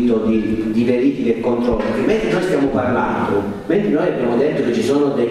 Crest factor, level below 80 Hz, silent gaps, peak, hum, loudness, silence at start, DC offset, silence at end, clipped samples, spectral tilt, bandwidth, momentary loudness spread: 14 dB; -40 dBFS; none; -4 dBFS; none; -17 LUFS; 0 s; under 0.1%; 0 s; under 0.1%; -7 dB/octave; 12.5 kHz; 3 LU